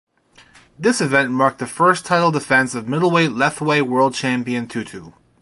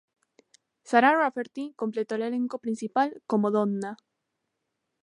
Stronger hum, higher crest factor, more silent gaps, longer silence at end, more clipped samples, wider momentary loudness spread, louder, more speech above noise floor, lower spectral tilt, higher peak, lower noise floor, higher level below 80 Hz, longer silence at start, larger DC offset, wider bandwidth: neither; about the same, 18 dB vs 22 dB; neither; second, 0.3 s vs 1.1 s; neither; second, 8 LU vs 13 LU; first, -18 LUFS vs -26 LUFS; second, 33 dB vs 55 dB; about the same, -5 dB/octave vs -6 dB/octave; first, -2 dBFS vs -6 dBFS; second, -51 dBFS vs -81 dBFS; first, -60 dBFS vs -82 dBFS; about the same, 0.8 s vs 0.85 s; neither; about the same, 11.5 kHz vs 11 kHz